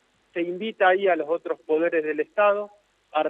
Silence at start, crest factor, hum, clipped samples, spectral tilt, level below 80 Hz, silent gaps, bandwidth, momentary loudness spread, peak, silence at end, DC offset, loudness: 0.35 s; 18 dB; none; under 0.1%; -6.5 dB/octave; -80 dBFS; none; 4.1 kHz; 10 LU; -8 dBFS; 0 s; under 0.1%; -24 LUFS